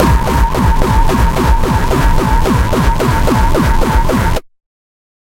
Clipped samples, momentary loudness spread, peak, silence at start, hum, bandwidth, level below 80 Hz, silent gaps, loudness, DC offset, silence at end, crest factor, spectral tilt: under 0.1%; 1 LU; 0 dBFS; 0 s; none; 16.5 kHz; -14 dBFS; none; -13 LUFS; under 0.1%; 0.85 s; 10 dB; -6 dB/octave